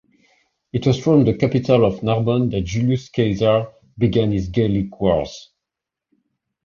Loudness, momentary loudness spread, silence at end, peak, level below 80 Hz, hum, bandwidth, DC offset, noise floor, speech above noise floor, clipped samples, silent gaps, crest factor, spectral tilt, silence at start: -19 LUFS; 6 LU; 1.2 s; -2 dBFS; -42 dBFS; none; 7.2 kHz; under 0.1%; -85 dBFS; 67 dB; under 0.1%; none; 16 dB; -7.5 dB/octave; 0.75 s